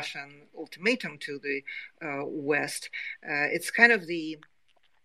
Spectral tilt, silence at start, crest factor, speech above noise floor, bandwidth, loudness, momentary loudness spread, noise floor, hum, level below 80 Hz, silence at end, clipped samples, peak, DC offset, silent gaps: -3.5 dB/octave; 0 s; 26 dB; 41 dB; 13.5 kHz; -27 LUFS; 20 LU; -70 dBFS; none; -80 dBFS; 0.65 s; under 0.1%; -4 dBFS; under 0.1%; none